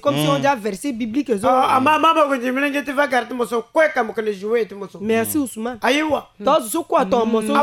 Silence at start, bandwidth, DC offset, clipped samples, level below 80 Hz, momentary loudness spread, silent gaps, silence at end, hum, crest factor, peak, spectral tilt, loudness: 0.05 s; 17 kHz; under 0.1%; under 0.1%; -56 dBFS; 8 LU; none; 0 s; none; 16 dB; -2 dBFS; -4.5 dB/octave; -19 LUFS